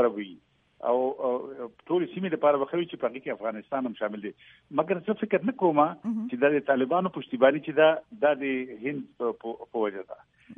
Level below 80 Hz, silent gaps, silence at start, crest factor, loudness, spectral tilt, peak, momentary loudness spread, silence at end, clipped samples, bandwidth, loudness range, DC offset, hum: -76 dBFS; none; 0 s; 20 dB; -27 LUFS; -9 dB/octave; -8 dBFS; 12 LU; 0.05 s; under 0.1%; 3.8 kHz; 5 LU; under 0.1%; none